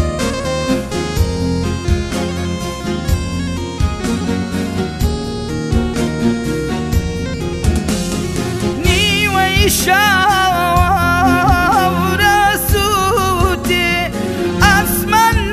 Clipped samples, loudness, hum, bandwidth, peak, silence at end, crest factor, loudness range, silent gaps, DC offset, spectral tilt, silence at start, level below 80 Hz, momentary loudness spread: under 0.1%; -15 LUFS; none; 15.5 kHz; 0 dBFS; 0 s; 14 dB; 7 LU; none; under 0.1%; -4.5 dB/octave; 0 s; -24 dBFS; 9 LU